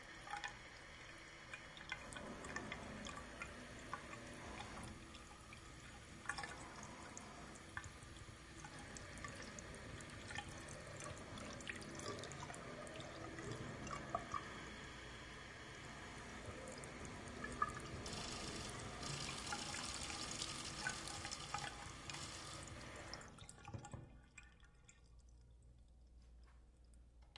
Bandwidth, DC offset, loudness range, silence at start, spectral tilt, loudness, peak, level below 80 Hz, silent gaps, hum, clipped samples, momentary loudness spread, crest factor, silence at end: 11.5 kHz; under 0.1%; 7 LU; 0 s; -3 dB/octave; -50 LUFS; -24 dBFS; -64 dBFS; none; none; under 0.1%; 17 LU; 26 dB; 0 s